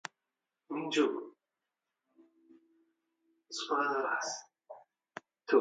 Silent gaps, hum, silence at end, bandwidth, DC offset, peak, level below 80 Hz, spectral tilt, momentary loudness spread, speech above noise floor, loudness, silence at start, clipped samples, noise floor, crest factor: none; none; 0 s; 9 kHz; under 0.1%; -12 dBFS; under -90 dBFS; -2.5 dB/octave; 23 LU; 56 dB; -34 LUFS; 0.7 s; under 0.1%; -89 dBFS; 24 dB